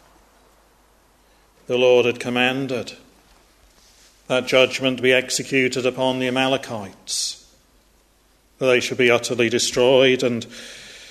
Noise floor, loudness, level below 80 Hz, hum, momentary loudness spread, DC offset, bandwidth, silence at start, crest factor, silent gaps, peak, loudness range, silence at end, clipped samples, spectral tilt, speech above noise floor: -58 dBFS; -19 LUFS; -58 dBFS; none; 15 LU; under 0.1%; 13.5 kHz; 1.7 s; 20 dB; none; -2 dBFS; 4 LU; 0 s; under 0.1%; -3.5 dB/octave; 39 dB